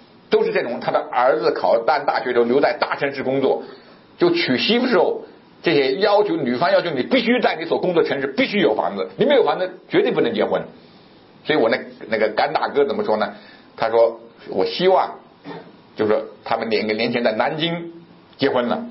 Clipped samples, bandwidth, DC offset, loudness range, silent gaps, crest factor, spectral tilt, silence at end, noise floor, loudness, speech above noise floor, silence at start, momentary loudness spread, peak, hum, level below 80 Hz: under 0.1%; 5.8 kHz; under 0.1%; 3 LU; none; 16 dB; -9 dB/octave; 0 s; -48 dBFS; -19 LUFS; 29 dB; 0.3 s; 9 LU; -4 dBFS; none; -66 dBFS